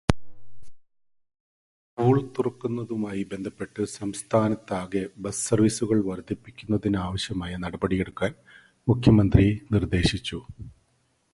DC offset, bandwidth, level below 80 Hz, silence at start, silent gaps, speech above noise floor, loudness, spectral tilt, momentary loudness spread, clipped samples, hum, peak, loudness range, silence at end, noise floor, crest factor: under 0.1%; 11.5 kHz; -42 dBFS; 0.1 s; 1.40-1.97 s; 44 dB; -26 LUFS; -6 dB/octave; 13 LU; under 0.1%; none; 0 dBFS; 5 LU; 0.65 s; -69 dBFS; 26 dB